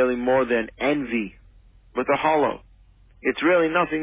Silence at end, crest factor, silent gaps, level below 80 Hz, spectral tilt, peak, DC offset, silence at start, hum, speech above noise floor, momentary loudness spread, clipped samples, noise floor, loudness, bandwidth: 0 s; 16 dB; none; -52 dBFS; -9 dB/octave; -8 dBFS; under 0.1%; 0 s; none; 31 dB; 9 LU; under 0.1%; -53 dBFS; -22 LUFS; 3.8 kHz